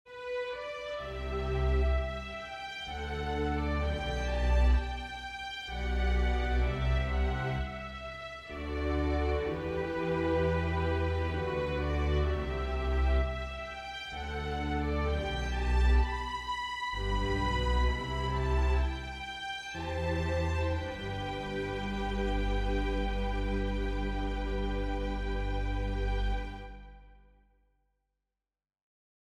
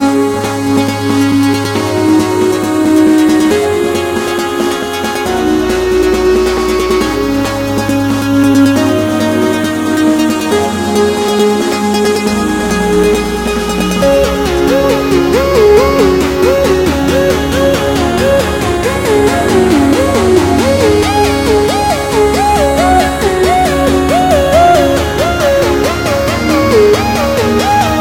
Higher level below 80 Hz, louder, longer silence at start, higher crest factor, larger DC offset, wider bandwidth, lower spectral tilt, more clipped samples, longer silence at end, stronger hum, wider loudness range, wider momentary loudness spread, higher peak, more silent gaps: second, -34 dBFS vs -26 dBFS; second, -33 LUFS vs -10 LUFS; about the same, 0.05 s vs 0 s; about the same, 14 dB vs 10 dB; second, under 0.1% vs 0.2%; second, 8.4 kHz vs 17 kHz; first, -6.5 dB/octave vs -5 dB/octave; neither; first, 2.15 s vs 0 s; neither; about the same, 3 LU vs 2 LU; first, 9 LU vs 5 LU; second, -16 dBFS vs 0 dBFS; neither